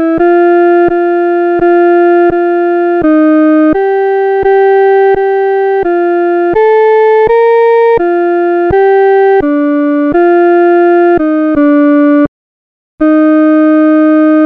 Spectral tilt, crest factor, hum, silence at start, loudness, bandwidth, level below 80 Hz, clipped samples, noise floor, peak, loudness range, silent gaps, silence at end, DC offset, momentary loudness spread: -8.5 dB/octave; 6 dB; none; 0 s; -8 LUFS; 4.6 kHz; -40 dBFS; under 0.1%; under -90 dBFS; 0 dBFS; 1 LU; 12.28-12.98 s; 0 s; under 0.1%; 3 LU